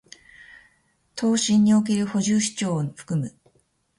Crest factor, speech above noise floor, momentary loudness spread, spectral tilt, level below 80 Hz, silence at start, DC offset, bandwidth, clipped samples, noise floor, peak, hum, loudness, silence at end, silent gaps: 14 dB; 44 dB; 10 LU; -5 dB/octave; -62 dBFS; 1.15 s; under 0.1%; 11.5 kHz; under 0.1%; -66 dBFS; -10 dBFS; none; -22 LUFS; 0.7 s; none